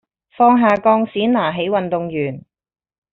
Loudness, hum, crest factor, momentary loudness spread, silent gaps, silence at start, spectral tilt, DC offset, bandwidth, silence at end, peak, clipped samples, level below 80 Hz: -16 LUFS; none; 16 dB; 11 LU; none; 0.4 s; -4.5 dB/octave; under 0.1%; 5.2 kHz; 0.7 s; -2 dBFS; under 0.1%; -58 dBFS